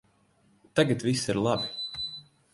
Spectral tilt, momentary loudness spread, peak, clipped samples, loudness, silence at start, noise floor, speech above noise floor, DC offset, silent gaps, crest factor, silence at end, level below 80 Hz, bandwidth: -5 dB/octave; 10 LU; -8 dBFS; under 0.1%; -28 LUFS; 0.75 s; -65 dBFS; 39 dB; under 0.1%; none; 22 dB; 0.3 s; -60 dBFS; 11.5 kHz